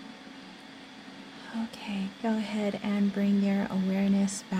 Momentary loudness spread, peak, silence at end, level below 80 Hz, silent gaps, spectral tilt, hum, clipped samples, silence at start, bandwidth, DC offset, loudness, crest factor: 20 LU; -18 dBFS; 0 s; -66 dBFS; none; -6 dB/octave; none; under 0.1%; 0 s; 11 kHz; under 0.1%; -29 LUFS; 12 dB